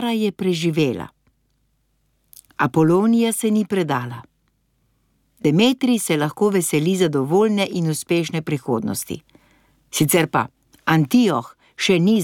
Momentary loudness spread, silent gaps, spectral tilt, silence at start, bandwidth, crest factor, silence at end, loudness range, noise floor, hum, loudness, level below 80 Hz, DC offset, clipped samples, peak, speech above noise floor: 11 LU; none; -5 dB/octave; 0 s; 17.5 kHz; 16 dB; 0 s; 3 LU; -66 dBFS; none; -19 LUFS; -60 dBFS; under 0.1%; under 0.1%; -4 dBFS; 48 dB